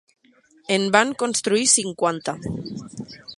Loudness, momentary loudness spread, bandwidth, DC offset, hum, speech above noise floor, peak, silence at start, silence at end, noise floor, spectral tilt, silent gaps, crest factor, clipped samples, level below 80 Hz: -20 LUFS; 19 LU; 11.5 kHz; under 0.1%; none; 35 dB; 0 dBFS; 0.7 s; 0.05 s; -57 dBFS; -2.5 dB/octave; none; 22 dB; under 0.1%; -56 dBFS